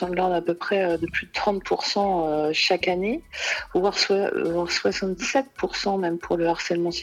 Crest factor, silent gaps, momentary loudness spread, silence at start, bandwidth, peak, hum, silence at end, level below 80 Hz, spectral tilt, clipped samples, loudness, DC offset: 16 dB; none; 5 LU; 0 s; 13 kHz; -8 dBFS; none; 0 s; -52 dBFS; -4 dB/octave; under 0.1%; -24 LUFS; under 0.1%